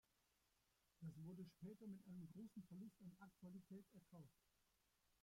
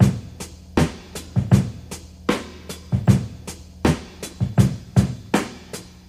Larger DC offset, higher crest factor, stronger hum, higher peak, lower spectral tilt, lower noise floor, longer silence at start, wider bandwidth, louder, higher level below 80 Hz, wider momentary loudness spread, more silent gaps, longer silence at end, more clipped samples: neither; second, 14 dB vs 20 dB; neither; second, -48 dBFS vs -2 dBFS; first, -8 dB/octave vs -6.5 dB/octave; first, -85 dBFS vs -38 dBFS; first, 1 s vs 0 s; about the same, 16.5 kHz vs 15 kHz; second, -61 LUFS vs -22 LUFS; second, -88 dBFS vs -36 dBFS; second, 7 LU vs 17 LU; neither; second, 0.1 s vs 0.25 s; neither